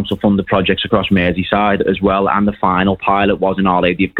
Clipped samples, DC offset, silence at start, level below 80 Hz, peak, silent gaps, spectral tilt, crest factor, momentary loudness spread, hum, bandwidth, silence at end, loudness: under 0.1%; under 0.1%; 0 s; -38 dBFS; 0 dBFS; none; -8.5 dB/octave; 14 dB; 1 LU; none; 4.3 kHz; 0 s; -14 LUFS